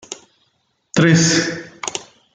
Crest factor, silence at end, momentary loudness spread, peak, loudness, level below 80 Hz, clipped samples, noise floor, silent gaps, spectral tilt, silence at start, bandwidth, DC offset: 16 dB; 0.3 s; 20 LU; -2 dBFS; -17 LUFS; -56 dBFS; under 0.1%; -66 dBFS; none; -4 dB/octave; 0.1 s; 9.4 kHz; under 0.1%